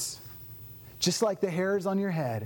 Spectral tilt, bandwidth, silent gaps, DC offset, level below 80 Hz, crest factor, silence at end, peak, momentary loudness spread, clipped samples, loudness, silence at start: -4.5 dB/octave; over 20 kHz; none; under 0.1%; -64 dBFS; 16 dB; 0 s; -14 dBFS; 17 LU; under 0.1%; -29 LUFS; 0 s